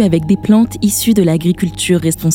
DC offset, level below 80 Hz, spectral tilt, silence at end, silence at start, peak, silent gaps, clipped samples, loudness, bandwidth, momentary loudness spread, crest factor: under 0.1%; -38 dBFS; -5.5 dB/octave; 0 s; 0 s; 0 dBFS; none; under 0.1%; -13 LUFS; 18.5 kHz; 3 LU; 12 dB